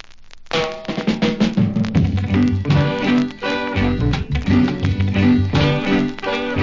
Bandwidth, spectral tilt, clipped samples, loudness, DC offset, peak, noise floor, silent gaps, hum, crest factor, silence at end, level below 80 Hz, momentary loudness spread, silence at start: 7.6 kHz; -7 dB/octave; under 0.1%; -18 LUFS; 0.1%; -4 dBFS; -38 dBFS; none; none; 14 dB; 0 s; -30 dBFS; 6 LU; 0.05 s